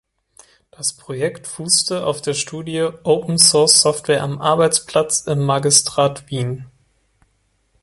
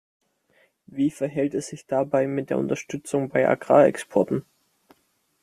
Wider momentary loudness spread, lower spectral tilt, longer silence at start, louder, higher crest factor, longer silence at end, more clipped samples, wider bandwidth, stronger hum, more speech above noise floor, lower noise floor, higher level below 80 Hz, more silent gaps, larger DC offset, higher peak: about the same, 13 LU vs 11 LU; second, -3 dB/octave vs -6.5 dB/octave; about the same, 0.8 s vs 0.9 s; first, -16 LUFS vs -23 LUFS; about the same, 18 dB vs 22 dB; first, 1.15 s vs 1 s; neither; first, 16 kHz vs 14.5 kHz; neither; about the same, 46 dB vs 45 dB; second, -64 dBFS vs -68 dBFS; first, -56 dBFS vs -66 dBFS; neither; neither; about the same, 0 dBFS vs -2 dBFS